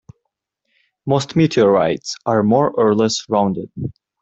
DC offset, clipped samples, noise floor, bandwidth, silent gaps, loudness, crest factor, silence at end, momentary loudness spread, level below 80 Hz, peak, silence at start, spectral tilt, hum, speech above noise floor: under 0.1%; under 0.1%; -76 dBFS; 8.2 kHz; none; -17 LUFS; 16 dB; 0.3 s; 14 LU; -54 dBFS; -2 dBFS; 1.05 s; -6 dB/octave; none; 59 dB